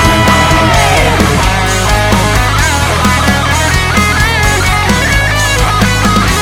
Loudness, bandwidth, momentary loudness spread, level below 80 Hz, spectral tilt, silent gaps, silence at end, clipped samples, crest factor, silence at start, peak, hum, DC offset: -9 LUFS; 17.5 kHz; 2 LU; -18 dBFS; -4 dB/octave; none; 0 s; 0.3%; 8 dB; 0 s; 0 dBFS; none; 0.4%